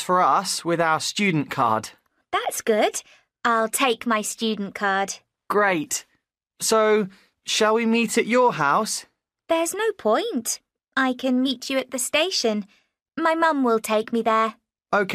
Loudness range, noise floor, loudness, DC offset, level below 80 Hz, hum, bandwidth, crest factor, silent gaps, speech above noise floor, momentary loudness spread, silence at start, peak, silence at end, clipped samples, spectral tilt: 2 LU; -72 dBFS; -22 LUFS; under 0.1%; -68 dBFS; none; 15.5 kHz; 16 dB; none; 50 dB; 9 LU; 0 s; -8 dBFS; 0 s; under 0.1%; -3 dB/octave